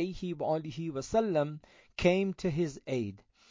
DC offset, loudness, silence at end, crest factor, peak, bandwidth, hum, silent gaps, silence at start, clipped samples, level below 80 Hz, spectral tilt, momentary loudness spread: under 0.1%; -32 LUFS; 0.35 s; 18 dB; -14 dBFS; 7.6 kHz; none; none; 0 s; under 0.1%; -56 dBFS; -6.5 dB/octave; 9 LU